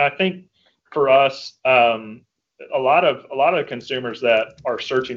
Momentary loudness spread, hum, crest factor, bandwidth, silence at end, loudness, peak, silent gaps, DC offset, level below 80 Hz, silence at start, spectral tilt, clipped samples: 11 LU; none; 18 dB; 7.4 kHz; 0 s; -19 LUFS; -2 dBFS; none; under 0.1%; -66 dBFS; 0 s; -5.5 dB/octave; under 0.1%